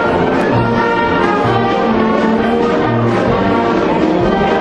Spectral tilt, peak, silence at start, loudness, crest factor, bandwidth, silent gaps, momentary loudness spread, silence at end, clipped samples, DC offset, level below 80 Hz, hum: -7.5 dB/octave; 0 dBFS; 0 s; -13 LUFS; 12 dB; 9.4 kHz; none; 1 LU; 0 s; under 0.1%; under 0.1%; -34 dBFS; none